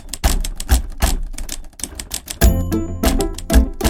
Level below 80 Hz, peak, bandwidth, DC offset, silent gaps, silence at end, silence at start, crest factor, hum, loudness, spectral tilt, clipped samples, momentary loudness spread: -20 dBFS; 0 dBFS; 17 kHz; under 0.1%; none; 0 s; 0.05 s; 18 dB; none; -20 LUFS; -4.5 dB/octave; under 0.1%; 11 LU